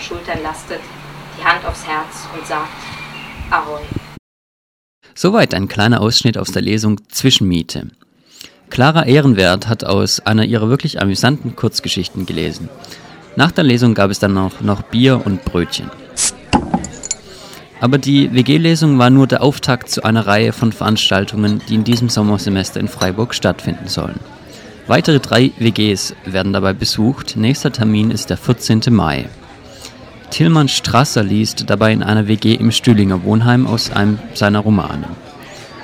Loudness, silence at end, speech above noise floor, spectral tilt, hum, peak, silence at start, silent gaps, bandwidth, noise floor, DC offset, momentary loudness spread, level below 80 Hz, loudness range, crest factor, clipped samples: -14 LUFS; 0 s; 27 dB; -5 dB/octave; none; 0 dBFS; 0 s; 4.19-5.02 s; 16.5 kHz; -41 dBFS; under 0.1%; 16 LU; -40 dBFS; 5 LU; 14 dB; under 0.1%